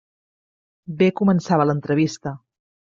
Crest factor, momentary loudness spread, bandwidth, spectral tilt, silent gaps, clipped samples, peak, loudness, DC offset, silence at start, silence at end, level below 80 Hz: 18 dB; 16 LU; 7.6 kHz; -7 dB/octave; none; under 0.1%; -4 dBFS; -20 LUFS; under 0.1%; 0.9 s; 0.55 s; -62 dBFS